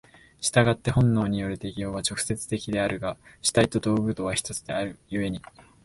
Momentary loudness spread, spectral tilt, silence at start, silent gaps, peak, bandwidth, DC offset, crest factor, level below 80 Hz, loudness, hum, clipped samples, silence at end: 10 LU; -5 dB/octave; 0.4 s; none; -4 dBFS; 12 kHz; under 0.1%; 22 dB; -48 dBFS; -26 LUFS; none; under 0.1%; 0.25 s